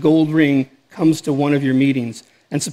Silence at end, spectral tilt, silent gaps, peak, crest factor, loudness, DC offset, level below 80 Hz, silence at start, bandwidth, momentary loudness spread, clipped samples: 0 s; -6 dB/octave; none; -2 dBFS; 14 dB; -17 LUFS; under 0.1%; -64 dBFS; 0 s; 14 kHz; 14 LU; under 0.1%